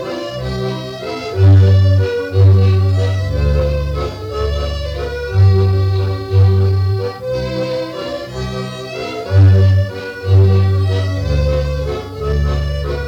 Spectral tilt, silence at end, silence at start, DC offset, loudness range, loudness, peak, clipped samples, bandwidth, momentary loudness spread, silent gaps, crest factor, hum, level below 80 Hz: -7.5 dB/octave; 0 s; 0 s; under 0.1%; 4 LU; -15 LUFS; -4 dBFS; under 0.1%; 6.8 kHz; 13 LU; none; 10 dB; none; -24 dBFS